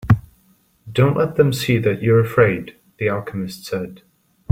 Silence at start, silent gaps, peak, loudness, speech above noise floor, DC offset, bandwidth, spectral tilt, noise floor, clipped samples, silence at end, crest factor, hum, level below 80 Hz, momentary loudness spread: 0.05 s; none; -2 dBFS; -19 LUFS; 40 dB; under 0.1%; 16 kHz; -7 dB/octave; -58 dBFS; under 0.1%; 0.55 s; 18 dB; none; -44 dBFS; 12 LU